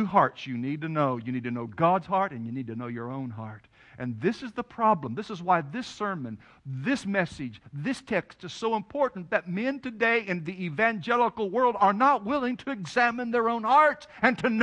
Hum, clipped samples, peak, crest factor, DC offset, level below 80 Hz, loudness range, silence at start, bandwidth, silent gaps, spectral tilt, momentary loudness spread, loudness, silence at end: none; under 0.1%; -4 dBFS; 22 dB; under 0.1%; -66 dBFS; 6 LU; 0 s; 11 kHz; none; -6.5 dB/octave; 13 LU; -27 LUFS; 0 s